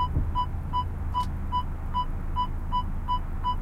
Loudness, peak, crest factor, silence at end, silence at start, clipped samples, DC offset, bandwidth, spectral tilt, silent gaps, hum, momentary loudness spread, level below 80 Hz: -31 LUFS; -16 dBFS; 12 dB; 0 s; 0 s; under 0.1%; under 0.1%; 7.4 kHz; -7 dB/octave; none; none; 2 LU; -32 dBFS